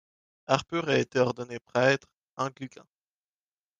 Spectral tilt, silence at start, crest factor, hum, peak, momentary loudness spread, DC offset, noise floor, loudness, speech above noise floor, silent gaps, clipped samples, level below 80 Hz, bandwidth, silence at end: -5 dB/octave; 0.5 s; 24 dB; none; -6 dBFS; 19 LU; under 0.1%; under -90 dBFS; -28 LUFS; over 62 dB; 1.61-1.65 s, 2.18-2.27 s, 2.33-2.37 s; under 0.1%; -70 dBFS; 9.4 kHz; 1.15 s